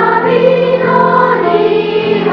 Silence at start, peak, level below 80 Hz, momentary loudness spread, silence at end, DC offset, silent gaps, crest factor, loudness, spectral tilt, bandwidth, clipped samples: 0 s; 0 dBFS; -50 dBFS; 3 LU; 0 s; under 0.1%; none; 10 dB; -10 LUFS; -8 dB/octave; 6.2 kHz; under 0.1%